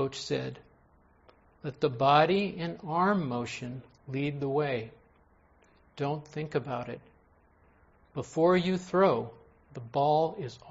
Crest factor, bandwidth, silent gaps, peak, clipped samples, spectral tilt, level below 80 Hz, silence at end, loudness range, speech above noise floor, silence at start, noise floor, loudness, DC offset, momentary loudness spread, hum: 22 dB; 8 kHz; none; -8 dBFS; under 0.1%; -6.5 dB/octave; -64 dBFS; 0 s; 8 LU; 34 dB; 0 s; -63 dBFS; -29 LUFS; under 0.1%; 18 LU; none